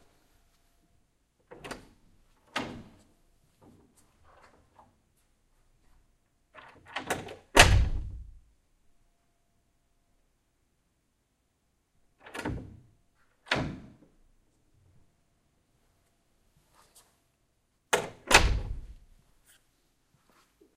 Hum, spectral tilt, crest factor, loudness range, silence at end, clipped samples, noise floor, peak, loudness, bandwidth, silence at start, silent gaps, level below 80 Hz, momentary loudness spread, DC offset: none; -3 dB/octave; 34 dB; 18 LU; 1.85 s; under 0.1%; -75 dBFS; 0 dBFS; -27 LUFS; 15.5 kHz; 1.65 s; none; -40 dBFS; 25 LU; under 0.1%